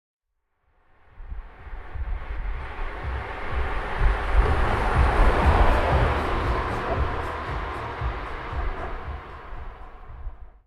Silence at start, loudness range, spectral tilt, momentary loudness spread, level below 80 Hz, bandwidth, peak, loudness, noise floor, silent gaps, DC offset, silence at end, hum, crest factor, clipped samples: 1.15 s; 12 LU; -7 dB/octave; 21 LU; -28 dBFS; 11 kHz; -6 dBFS; -26 LUFS; -74 dBFS; none; under 0.1%; 0.2 s; none; 18 dB; under 0.1%